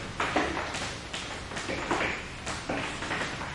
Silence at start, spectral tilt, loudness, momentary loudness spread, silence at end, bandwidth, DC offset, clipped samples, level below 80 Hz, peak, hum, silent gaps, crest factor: 0 s; -3.5 dB/octave; -32 LUFS; 7 LU; 0 s; 11.5 kHz; under 0.1%; under 0.1%; -48 dBFS; -14 dBFS; none; none; 20 dB